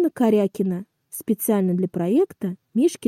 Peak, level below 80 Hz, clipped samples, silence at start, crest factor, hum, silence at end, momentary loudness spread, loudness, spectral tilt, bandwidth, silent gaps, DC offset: -10 dBFS; -70 dBFS; under 0.1%; 0 s; 12 dB; none; 0 s; 12 LU; -22 LUFS; -7 dB/octave; 16 kHz; none; under 0.1%